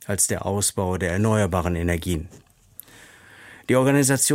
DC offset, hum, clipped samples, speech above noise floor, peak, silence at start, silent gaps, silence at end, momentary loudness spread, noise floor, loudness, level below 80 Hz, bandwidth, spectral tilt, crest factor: under 0.1%; none; under 0.1%; 27 dB; -6 dBFS; 0 s; none; 0 s; 12 LU; -49 dBFS; -22 LUFS; -42 dBFS; 16.5 kHz; -4.5 dB/octave; 16 dB